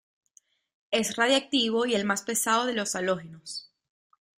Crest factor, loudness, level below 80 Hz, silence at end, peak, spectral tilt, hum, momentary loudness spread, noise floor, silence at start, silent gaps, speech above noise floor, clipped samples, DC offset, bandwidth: 18 dB; -26 LUFS; -70 dBFS; 0.8 s; -10 dBFS; -2.5 dB/octave; none; 15 LU; -64 dBFS; 0.9 s; none; 37 dB; under 0.1%; under 0.1%; 15.5 kHz